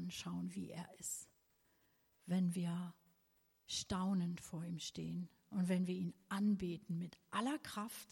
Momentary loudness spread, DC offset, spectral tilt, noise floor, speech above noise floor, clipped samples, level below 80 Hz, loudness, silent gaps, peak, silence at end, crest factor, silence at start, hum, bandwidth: 10 LU; under 0.1%; -5 dB/octave; -78 dBFS; 36 dB; under 0.1%; -72 dBFS; -42 LUFS; none; -26 dBFS; 0.1 s; 16 dB; 0 s; none; 16.5 kHz